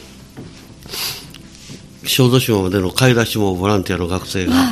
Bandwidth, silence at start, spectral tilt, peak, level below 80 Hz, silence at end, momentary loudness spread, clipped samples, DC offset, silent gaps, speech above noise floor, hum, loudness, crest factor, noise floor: 15.5 kHz; 0 s; -5 dB/octave; 0 dBFS; -42 dBFS; 0 s; 23 LU; under 0.1%; under 0.1%; none; 22 dB; none; -16 LUFS; 18 dB; -37 dBFS